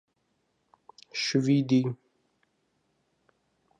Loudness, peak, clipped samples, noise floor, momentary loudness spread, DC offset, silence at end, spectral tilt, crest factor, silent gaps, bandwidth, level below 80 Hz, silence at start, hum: -27 LUFS; -12 dBFS; under 0.1%; -75 dBFS; 14 LU; under 0.1%; 1.85 s; -6 dB/octave; 20 dB; none; 9.2 kHz; -78 dBFS; 1.15 s; none